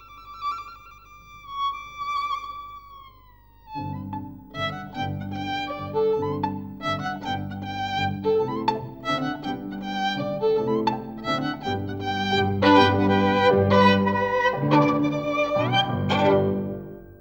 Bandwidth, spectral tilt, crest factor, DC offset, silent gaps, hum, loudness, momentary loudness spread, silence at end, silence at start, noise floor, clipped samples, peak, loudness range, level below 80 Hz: 16.5 kHz; -6.5 dB/octave; 20 dB; under 0.1%; none; 50 Hz at -45 dBFS; -24 LUFS; 15 LU; 0.05 s; 0 s; -52 dBFS; under 0.1%; -4 dBFS; 13 LU; -54 dBFS